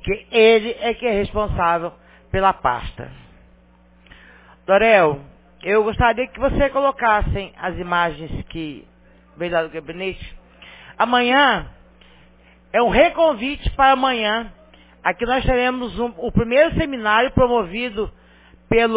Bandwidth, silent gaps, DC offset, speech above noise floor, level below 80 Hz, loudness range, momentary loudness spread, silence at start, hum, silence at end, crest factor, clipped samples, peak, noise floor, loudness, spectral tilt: 4 kHz; none; under 0.1%; 33 dB; -36 dBFS; 6 LU; 15 LU; 0.05 s; none; 0 s; 18 dB; under 0.1%; 0 dBFS; -52 dBFS; -19 LUFS; -9 dB/octave